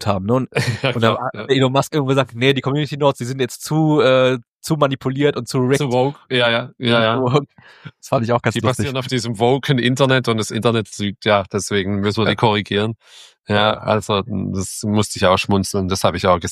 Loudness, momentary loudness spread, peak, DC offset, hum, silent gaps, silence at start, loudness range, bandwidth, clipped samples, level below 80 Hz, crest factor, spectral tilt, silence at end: -18 LUFS; 7 LU; 0 dBFS; under 0.1%; none; 4.48-4.54 s; 0 s; 2 LU; 15 kHz; under 0.1%; -52 dBFS; 18 dB; -5.5 dB/octave; 0 s